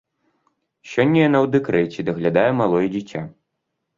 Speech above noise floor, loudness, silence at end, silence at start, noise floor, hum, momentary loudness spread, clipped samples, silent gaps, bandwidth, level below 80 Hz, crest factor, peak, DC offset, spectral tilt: 58 dB; -19 LUFS; 0.65 s; 0.85 s; -77 dBFS; none; 13 LU; under 0.1%; none; 7.6 kHz; -58 dBFS; 18 dB; -2 dBFS; under 0.1%; -7.5 dB/octave